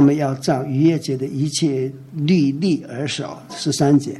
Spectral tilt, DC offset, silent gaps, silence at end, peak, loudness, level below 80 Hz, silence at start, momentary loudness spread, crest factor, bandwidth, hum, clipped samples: -6 dB/octave; under 0.1%; none; 0 s; -6 dBFS; -20 LUFS; -60 dBFS; 0 s; 9 LU; 14 dB; 12.5 kHz; none; under 0.1%